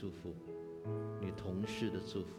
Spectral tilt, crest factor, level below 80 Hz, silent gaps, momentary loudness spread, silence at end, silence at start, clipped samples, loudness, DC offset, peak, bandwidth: -6.5 dB/octave; 16 dB; -66 dBFS; none; 9 LU; 0 s; 0 s; under 0.1%; -43 LUFS; under 0.1%; -26 dBFS; 14.5 kHz